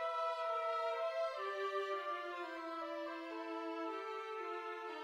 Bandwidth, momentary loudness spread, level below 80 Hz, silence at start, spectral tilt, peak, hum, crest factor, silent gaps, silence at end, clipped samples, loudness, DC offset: 13.5 kHz; 6 LU; under -90 dBFS; 0 s; -1.5 dB/octave; -28 dBFS; none; 14 dB; none; 0 s; under 0.1%; -42 LUFS; under 0.1%